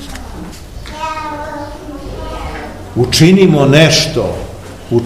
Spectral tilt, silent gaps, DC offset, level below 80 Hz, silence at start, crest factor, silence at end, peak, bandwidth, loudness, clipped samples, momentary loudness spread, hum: -5 dB/octave; none; 0.7%; -32 dBFS; 0 s; 14 dB; 0 s; 0 dBFS; 15.5 kHz; -11 LUFS; 0.9%; 22 LU; none